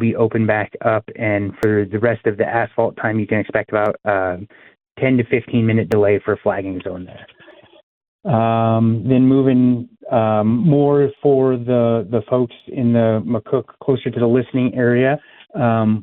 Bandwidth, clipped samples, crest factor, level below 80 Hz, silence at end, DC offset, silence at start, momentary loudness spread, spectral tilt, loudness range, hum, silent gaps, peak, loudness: 4.2 kHz; under 0.1%; 16 dB; -54 dBFS; 0 s; under 0.1%; 0 s; 7 LU; -10 dB/octave; 4 LU; none; 7.83-8.01 s, 8.08-8.19 s; -2 dBFS; -17 LUFS